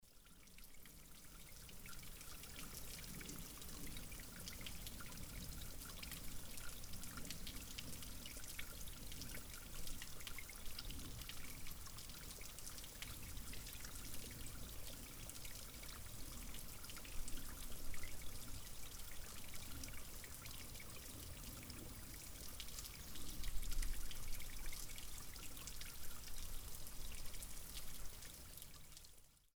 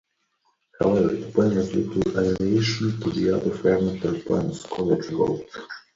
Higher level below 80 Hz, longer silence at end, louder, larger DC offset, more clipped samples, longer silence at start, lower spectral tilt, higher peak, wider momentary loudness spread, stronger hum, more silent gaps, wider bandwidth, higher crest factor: about the same, -54 dBFS vs -50 dBFS; about the same, 0.15 s vs 0.15 s; second, -52 LUFS vs -23 LUFS; neither; neither; second, 0 s vs 0.8 s; second, -2.5 dB/octave vs -7 dB/octave; second, -28 dBFS vs -6 dBFS; about the same, 4 LU vs 6 LU; neither; neither; first, over 20 kHz vs 7.8 kHz; about the same, 20 dB vs 18 dB